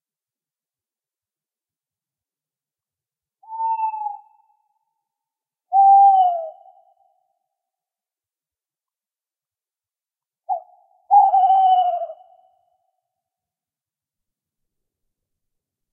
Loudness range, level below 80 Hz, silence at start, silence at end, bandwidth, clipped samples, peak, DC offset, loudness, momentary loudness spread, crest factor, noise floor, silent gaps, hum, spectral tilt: 13 LU; under -90 dBFS; 3.5 s; 3.8 s; 3.3 kHz; under 0.1%; -4 dBFS; under 0.1%; -17 LUFS; 19 LU; 18 dB; under -90 dBFS; none; none; -1.5 dB/octave